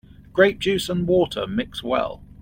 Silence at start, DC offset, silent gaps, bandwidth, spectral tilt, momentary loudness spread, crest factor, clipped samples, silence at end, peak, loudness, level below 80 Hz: 0.2 s; under 0.1%; none; 16.5 kHz; -5.5 dB/octave; 9 LU; 20 dB; under 0.1%; 0.15 s; -2 dBFS; -22 LUFS; -46 dBFS